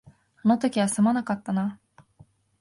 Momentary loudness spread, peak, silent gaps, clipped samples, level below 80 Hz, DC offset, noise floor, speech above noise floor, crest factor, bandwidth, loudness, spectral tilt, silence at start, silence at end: 6 LU; -10 dBFS; none; under 0.1%; -66 dBFS; under 0.1%; -57 dBFS; 34 dB; 16 dB; 11.5 kHz; -25 LUFS; -5.5 dB/octave; 0.45 s; 0.85 s